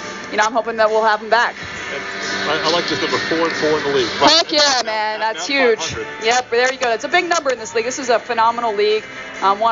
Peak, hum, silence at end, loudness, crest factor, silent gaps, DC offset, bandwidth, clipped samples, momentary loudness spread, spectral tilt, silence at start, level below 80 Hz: 0 dBFS; none; 0 s; -17 LUFS; 16 dB; none; under 0.1%; 7.6 kHz; under 0.1%; 8 LU; 0 dB/octave; 0 s; -54 dBFS